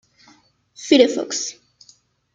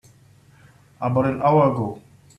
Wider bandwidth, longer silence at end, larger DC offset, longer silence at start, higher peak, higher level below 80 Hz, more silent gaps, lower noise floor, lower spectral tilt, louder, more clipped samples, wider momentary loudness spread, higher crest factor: second, 9.4 kHz vs 11 kHz; first, 0.85 s vs 0.4 s; neither; second, 0.8 s vs 1 s; first, -2 dBFS vs -6 dBFS; second, -70 dBFS vs -56 dBFS; neither; about the same, -55 dBFS vs -52 dBFS; second, -2 dB/octave vs -9.5 dB/octave; about the same, -18 LUFS vs -20 LUFS; neither; about the same, 15 LU vs 13 LU; about the same, 20 dB vs 18 dB